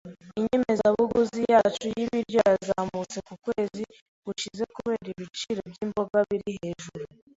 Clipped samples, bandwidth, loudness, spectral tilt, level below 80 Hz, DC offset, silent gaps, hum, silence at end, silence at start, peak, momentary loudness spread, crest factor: under 0.1%; 8 kHz; -27 LUFS; -5 dB/octave; -60 dBFS; under 0.1%; 4.01-4.23 s; none; 0.3 s; 0.05 s; -6 dBFS; 15 LU; 20 dB